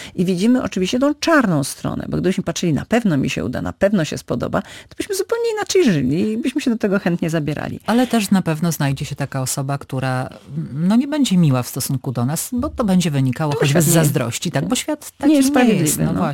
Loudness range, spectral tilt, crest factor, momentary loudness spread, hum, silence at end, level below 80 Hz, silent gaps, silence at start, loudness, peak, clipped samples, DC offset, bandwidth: 3 LU; -5.5 dB/octave; 16 dB; 9 LU; none; 0 s; -46 dBFS; none; 0 s; -18 LUFS; -2 dBFS; under 0.1%; under 0.1%; 17 kHz